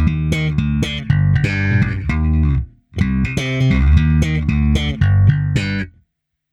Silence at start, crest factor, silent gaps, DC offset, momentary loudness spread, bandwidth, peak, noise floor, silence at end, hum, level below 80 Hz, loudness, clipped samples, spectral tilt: 0 s; 16 dB; none; under 0.1%; 7 LU; 10.5 kHz; 0 dBFS; -69 dBFS; 0.65 s; none; -22 dBFS; -17 LUFS; under 0.1%; -7 dB/octave